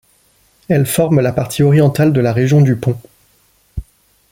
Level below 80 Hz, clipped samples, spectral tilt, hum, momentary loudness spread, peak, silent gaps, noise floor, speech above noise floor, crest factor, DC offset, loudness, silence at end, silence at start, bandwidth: -40 dBFS; under 0.1%; -7 dB/octave; none; 20 LU; -2 dBFS; none; -55 dBFS; 43 dB; 12 dB; under 0.1%; -13 LUFS; 0.5 s; 0.7 s; 17 kHz